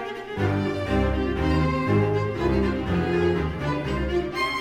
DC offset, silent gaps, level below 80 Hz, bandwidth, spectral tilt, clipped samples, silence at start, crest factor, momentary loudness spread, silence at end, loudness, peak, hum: under 0.1%; none; -34 dBFS; 14.5 kHz; -7.5 dB/octave; under 0.1%; 0 s; 12 dB; 4 LU; 0 s; -24 LUFS; -10 dBFS; none